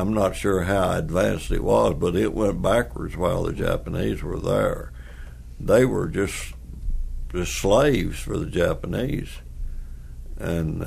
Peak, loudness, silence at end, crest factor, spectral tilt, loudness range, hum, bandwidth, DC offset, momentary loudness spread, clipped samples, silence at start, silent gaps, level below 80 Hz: -6 dBFS; -23 LUFS; 0 s; 18 dB; -6 dB/octave; 3 LU; none; 15.5 kHz; under 0.1%; 19 LU; under 0.1%; 0 s; none; -32 dBFS